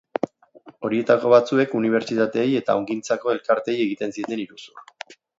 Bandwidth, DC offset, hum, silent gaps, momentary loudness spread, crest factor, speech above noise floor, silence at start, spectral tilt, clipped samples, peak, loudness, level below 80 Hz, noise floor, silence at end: 7.8 kHz; under 0.1%; none; none; 16 LU; 20 dB; 28 dB; 0.25 s; -5.5 dB/octave; under 0.1%; -2 dBFS; -22 LUFS; -70 dBFS; -50 dBFS; 0.25 s